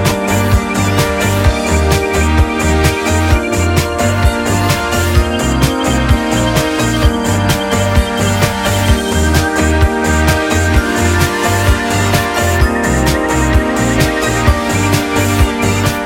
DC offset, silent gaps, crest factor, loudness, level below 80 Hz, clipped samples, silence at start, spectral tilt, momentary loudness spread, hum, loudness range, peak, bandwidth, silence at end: under 0.1%; none; 12 dB; -13 LUFS; -18 dBFS; under 0.1%; 0 s; -5 dB/octave; 1 LU; none; 1 LU; 0 dBFS; 16.5 kHz; 0 s